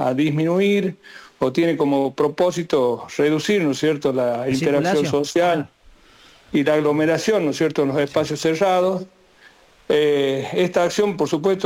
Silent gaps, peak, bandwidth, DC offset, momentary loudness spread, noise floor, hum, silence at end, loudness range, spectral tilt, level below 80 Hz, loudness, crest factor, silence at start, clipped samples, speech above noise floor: none; -8 dBFS; 16.5 kHz; under 0.1%; 4 LU; -51 dBFS; none; 0 s; 1 LU; -5.5 dB/octave; -58 dBFS; -20 LUFS; 12 dB; 0 s; under 0.1%; 32 dB